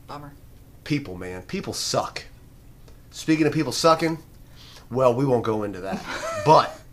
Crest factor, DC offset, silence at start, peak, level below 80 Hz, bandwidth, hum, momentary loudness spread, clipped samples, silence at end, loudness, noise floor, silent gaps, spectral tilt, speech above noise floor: 22 dB; under 0.1%; 0.1 s; -2 dBFS; -50 dBFS; 15.5 kHz; none; 17 LU; under 0.1%; 0 s; -23 LUFS; -47 dBFS; none; -5 dB/octave; 24 dB